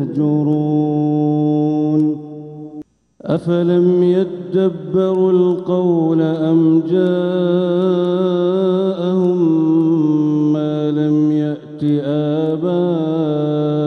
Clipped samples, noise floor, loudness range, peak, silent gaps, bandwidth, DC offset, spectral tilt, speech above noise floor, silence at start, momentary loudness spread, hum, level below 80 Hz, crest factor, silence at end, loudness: under 0.1%; -36 dBFS; 2 LU; -4 dBFS; none; 6.2 kHz; under 0.1%; -10 dB/octave; 21 dB; 0 s; 6 LU; none; -64 dBFS; 12 dB; 0 s; -16 LUFS